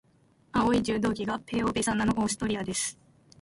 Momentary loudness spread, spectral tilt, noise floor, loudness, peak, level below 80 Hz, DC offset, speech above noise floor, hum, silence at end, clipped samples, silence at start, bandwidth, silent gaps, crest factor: 6 LU; -4 dB/octave; -63 dBFS; -28 LUFS; -12 dBFS; -50 dBFS; under 0.1%; 36 dB; none; 0.5 s; under 0.1%; 0.55 s; 11.5 kHz; none; 16 dB